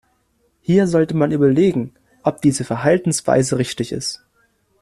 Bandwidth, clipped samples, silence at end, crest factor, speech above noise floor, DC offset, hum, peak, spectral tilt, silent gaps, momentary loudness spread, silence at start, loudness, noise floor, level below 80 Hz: 13.5 kHz; under 0.1%; 0.65 s; 16 dB; 47 dB; under 0.1%; none; -2 dBFS; -6 dB/octave; none; 11 LU; 0.7 s; -18 LUFS; -63 dBFS; -52 dBFS